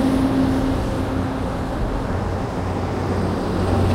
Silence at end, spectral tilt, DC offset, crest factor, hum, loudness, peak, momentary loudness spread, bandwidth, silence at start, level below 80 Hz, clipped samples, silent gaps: 0 s; -7.5 dB/octave; under 0.1%; 16 dB; none; -22 LUFS; -6 dBFS; 6 LU; 15.5 kHz; 0 s; -30 dBFS; under 0.1%; none